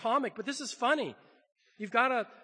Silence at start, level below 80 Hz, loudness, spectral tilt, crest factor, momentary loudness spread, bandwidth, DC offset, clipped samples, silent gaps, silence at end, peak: 0 s; under -90 dBFS; -31 LUFS; -3 dB/octave; 22 dB; 10 LU; 9.8 kHz; under 0.1%; under 0.1%; none; 0.1 s; -10 dBFS